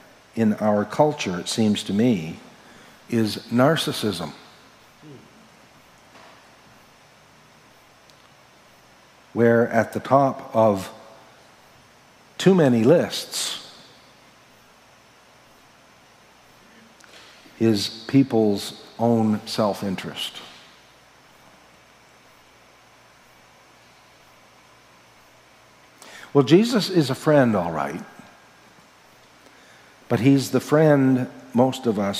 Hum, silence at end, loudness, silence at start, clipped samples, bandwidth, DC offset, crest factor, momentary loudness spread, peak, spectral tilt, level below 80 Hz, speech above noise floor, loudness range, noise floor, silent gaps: none; 0 s; -21 LUFS; 0.35 s; under 0.1%; 16 kHz; under 0.1%; 22 dB; 17 LU; -2 dBFS; -6 dB/octave; -66 dBFS; 33 dB; 9 LU; -53 dBFS; none